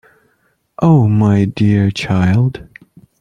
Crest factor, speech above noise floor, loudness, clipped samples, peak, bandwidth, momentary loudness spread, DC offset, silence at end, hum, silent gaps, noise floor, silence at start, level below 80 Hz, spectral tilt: 12 dB; 49 dB; -13 LUFS; under 0.1%; -2 dBFS; 9.2 kHz; 6 LU; under 0.1%; 0.6 s; none; none; -61 dBFS; 0.8 s; -46 dBFS; -8 dB/octave